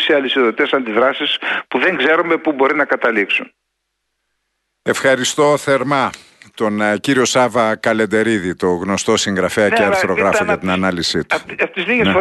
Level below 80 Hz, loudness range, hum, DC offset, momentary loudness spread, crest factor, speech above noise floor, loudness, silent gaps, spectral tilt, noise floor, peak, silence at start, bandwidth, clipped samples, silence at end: -52 dBFS; 3 LU; none; under 0.1%; 5 LU; 14 dB; 57 dB; -15 LUFS; none; -4 dB/octave; -73 dBFS; -2 dBFS; 0 s; 12.5 kHz; under 0.1%; 0 s